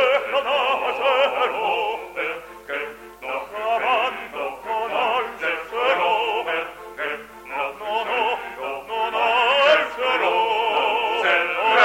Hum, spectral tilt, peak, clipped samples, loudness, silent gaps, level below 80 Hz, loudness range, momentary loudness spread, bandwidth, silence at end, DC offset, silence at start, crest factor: none; -2 dB/octave; -2 dBFS; under 0.1%; -21 LUFS; none; -60 dBFS; 5 LU; 11 LU; 16.5 kHz; 0 s; under 0.1%; 0 s; 20 dB